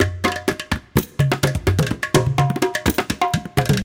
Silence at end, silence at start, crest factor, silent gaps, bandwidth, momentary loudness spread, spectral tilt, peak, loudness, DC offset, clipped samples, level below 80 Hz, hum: 0 s; 0 s; 18 dB; none; 17 kHz; 4 LU; -5 dB/octave; -2 dBFS; -20 LUFS; under 0.1%; under 0.1%; -34 dBFS; none